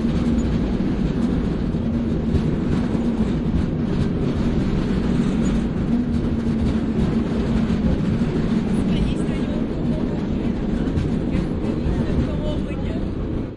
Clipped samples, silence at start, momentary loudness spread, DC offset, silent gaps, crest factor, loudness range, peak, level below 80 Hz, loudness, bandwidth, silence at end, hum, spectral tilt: under 0.1%; 0 s; 3 LU; under 0.1%; none; 14 dB; 2 LU; -6 dBFS; -28 dBFS; -22 LUFS; 11 kHz; 0 s; none; -8.5 dB/octave